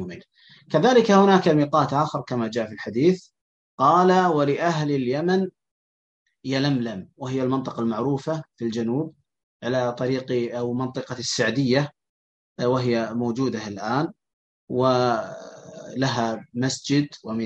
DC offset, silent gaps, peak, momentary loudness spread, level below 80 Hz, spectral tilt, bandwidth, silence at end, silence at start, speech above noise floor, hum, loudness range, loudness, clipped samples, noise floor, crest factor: under 0.1%; 3.41-3.78 s, 5.71-6.26 s, 9.43-9.60 s, 12.09-12.56 s, 14.33-14.68 s; -4 dBFS; 13 LU; -66 dBFS; -6 dB/octave; 8.6 kHz; 0 s; 0 s; 31 dB; none; 6 LU; -23 LUFS; under 0.1%; -53 dBFS; 20 dB